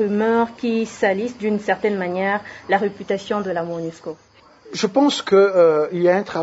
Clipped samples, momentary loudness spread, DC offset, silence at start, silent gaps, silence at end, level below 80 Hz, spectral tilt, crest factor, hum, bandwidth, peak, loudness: under 0.1%; 11 LU; under 0.1%; 0 s; none; 0 s; -64 dBFS; -5.5 dB/octave; 16 dB; none; 8 kHz; -4 dBFS; -19 LUFS